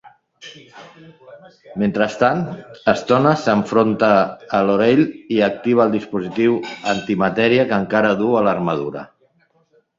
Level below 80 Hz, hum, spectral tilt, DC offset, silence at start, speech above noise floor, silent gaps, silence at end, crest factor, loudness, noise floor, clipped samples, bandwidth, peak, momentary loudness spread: -56 dBFS; none; -6.5 dB/octave; under 0.1%; 0.05 s; 42 dB; none; 0.95 s; 18 dB; -17 LUFS; -60 dBFS; under 0.1%; 7.6 kHz; 0 dBFS; 9 LU